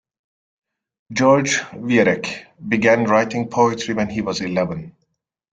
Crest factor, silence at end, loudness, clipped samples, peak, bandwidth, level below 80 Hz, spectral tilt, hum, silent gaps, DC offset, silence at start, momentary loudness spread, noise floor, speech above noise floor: 18 dB; 0.65 s; -19 LUFS; under 0.1%; -2 dBFS; 9.2 kHz; -56 dBFS; -5 dB/octave; none; none; under 0.1%; 1.1 s; 11 LU; -72 dBFS; 54 dB